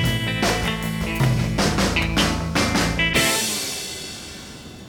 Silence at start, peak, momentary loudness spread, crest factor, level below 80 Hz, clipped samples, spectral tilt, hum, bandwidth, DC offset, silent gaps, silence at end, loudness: 0 s; -6 dBFS; 14 LU; 16 dB; -34 dBFS; under 0.1%; -3.5 dB/octave; none; 19.5 kHz; under 0.1%; none; 0 s; -21 LUFS